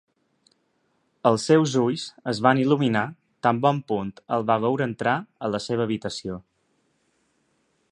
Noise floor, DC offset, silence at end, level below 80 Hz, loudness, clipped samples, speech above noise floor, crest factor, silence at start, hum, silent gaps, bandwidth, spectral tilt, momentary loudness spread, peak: -70 dBFS; under 0.1%; 1.5 s; -62 dBFS; -24 LUFS; under 0.1%; 47 dB; 22 dB; 1.25 s; none; none; 11 kHz; -6 dB/octave; 11 LU; -4 dBFS